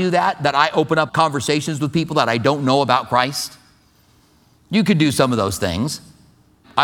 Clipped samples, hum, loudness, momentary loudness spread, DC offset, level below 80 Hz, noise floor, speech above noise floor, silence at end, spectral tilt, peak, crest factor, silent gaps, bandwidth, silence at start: under 0.1%; none; -18 LUFS; 7 LU; under 0.1%; -50 dBFS; -55 dBFS; 37 dB; 0 s; -5 dB/octave; 0 dBFS; 18 dB; none; 18.5 kHz; 0 s